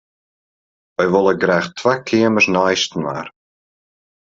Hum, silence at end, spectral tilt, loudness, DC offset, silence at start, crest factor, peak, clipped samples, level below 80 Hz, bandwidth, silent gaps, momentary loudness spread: none; 0.9 s; -4.5 dB/octave; -16 LUFS; under 0.1%; 1 s; 16 dB; -2 dBFS; under 0.1%; -60 dBFS; 7.8 kHz; none; 13 LU